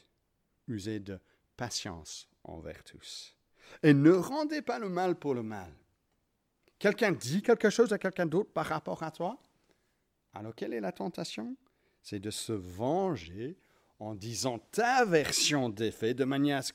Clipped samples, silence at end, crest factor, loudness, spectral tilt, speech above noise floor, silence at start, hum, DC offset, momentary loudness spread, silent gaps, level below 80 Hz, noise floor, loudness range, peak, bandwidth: under 0.1%; 0.05 s; 22 dB; -31 LUFS; -4.5 dB/octave; 47 dB; 0.7 s; none; under 0.1%; 20 LU; none; -66 dBFS; -78 dBFS; 10 LU; -12 dBFS; 16 kHz